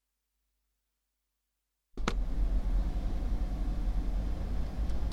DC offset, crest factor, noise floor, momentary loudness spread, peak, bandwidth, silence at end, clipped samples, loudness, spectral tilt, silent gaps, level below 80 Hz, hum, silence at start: under 0.1%; 20 dB; -84 dBFS; 3 LU; -12 dBFS; 7.6 kHz; 0 s; under 0.1%; -36 LUFS; -6.5 dB/octave; none; -34 dBFS; none; 1.95 s